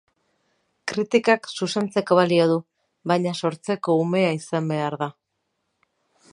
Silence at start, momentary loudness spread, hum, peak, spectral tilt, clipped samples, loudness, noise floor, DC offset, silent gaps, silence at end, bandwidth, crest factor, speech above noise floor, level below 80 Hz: 0.85 s; 10 LU; none; -4 dBFS; -6 dB/octave; under 0.1%; -22 LUFS; -76 dBFS; under 0.1%; none; 1.2 s; 11.5 kHz; 20 dB; 55 dB; -72 dBFS